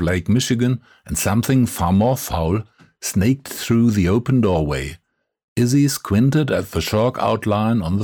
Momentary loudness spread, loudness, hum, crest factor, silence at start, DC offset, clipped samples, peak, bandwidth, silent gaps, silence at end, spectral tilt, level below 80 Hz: 7 LU; -19 LUFS; none; 12 dB; 0 s; under 0.1%; under 0.1%; -8 dBFS; over 20 kHz; 5.44-5.56 s; 0 s; -6 dB/octave; -38 dBFS